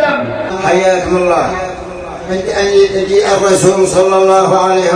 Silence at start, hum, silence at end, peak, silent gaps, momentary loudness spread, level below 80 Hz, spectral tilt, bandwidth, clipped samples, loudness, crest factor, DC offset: 0 s; none; 0 s; 0 dBFS; none; 11 LU; -38 dBFS; -4.5 dB/octave; 10.5 kHz; under 0.1%; -11 LUFS; 10 dB; under 0.1%